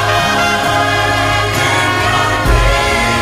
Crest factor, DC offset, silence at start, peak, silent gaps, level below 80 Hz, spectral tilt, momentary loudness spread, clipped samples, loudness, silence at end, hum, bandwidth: 12 dB; under 0.1%; 0 s; 0 dBFS; none; -22 dBFS; -4 dB/octave; 1 LU; under 0.1%; -12 LUFS; 0 s; none; 15.5 kHz